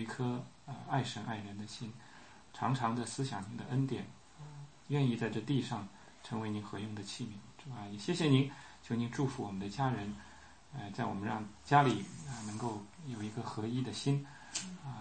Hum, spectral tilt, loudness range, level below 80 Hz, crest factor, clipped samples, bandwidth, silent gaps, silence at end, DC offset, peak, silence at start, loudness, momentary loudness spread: none; -6 dB/octave; 4 LU; -68 dBFS; 24 dB; under 0.1%; 8.4 kHz; none; 0 s; under 0.1%; -14 dBFS; 0 s; -37 LUFS; 19 LU